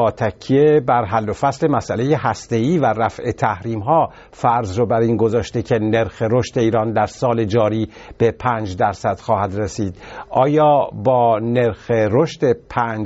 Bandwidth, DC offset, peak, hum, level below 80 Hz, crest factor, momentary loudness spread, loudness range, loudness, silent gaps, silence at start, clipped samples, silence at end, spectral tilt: 8 kHz; under 0.1%; -2 dBFS; none; -46 dBFS; 16 dB; 7 LU; 2 LU; -18 LUFS; none; 0 s; under 0.1%; 0 s; -6.5 dB/octave